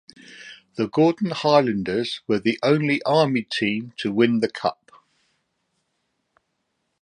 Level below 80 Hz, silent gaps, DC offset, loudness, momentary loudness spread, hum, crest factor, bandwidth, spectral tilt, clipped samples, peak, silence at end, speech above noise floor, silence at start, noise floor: -64 dBFS; none; under 0.1%; -22 LUFS; 9 LU; none; 22 dB; 10.5 kHz; -6.5 dB/octave; under 0.1%; -2 dBFS; 2.3 s; 54 dB; 0.3 s; -75 dBFS